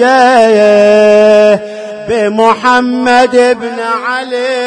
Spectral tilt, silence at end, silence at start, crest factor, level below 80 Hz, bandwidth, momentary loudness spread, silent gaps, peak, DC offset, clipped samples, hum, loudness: -4.5 dB/octave; 0 s; 0 s; 8 dB; -50 dBFS; 10.5 kHz; 9 LU; none; 0 dBFS; under 0.1%; 2%; none; -8 LUFS